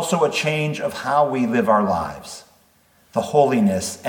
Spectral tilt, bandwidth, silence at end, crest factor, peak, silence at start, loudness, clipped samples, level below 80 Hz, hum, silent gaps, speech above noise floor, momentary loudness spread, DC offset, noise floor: -5 dB/octave; 19 kHz; 0 s; 18 dB; -4 dBFS; 0 s; -20 LUFS; under 0.1%; -56 dBFS; none; none; 38 dB; 12 LU; under 0.1%; -57 dBFS